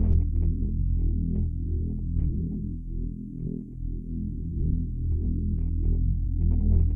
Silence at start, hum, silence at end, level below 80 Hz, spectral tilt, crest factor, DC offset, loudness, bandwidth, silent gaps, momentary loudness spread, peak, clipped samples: 0 s; none; 0 s; -28 dBFS; -14 dB/octave; 14 dB; under 0.1%; -29 LUFS; 0.9 kHz; none; 9 LU; -12 dBFS; under 0.1%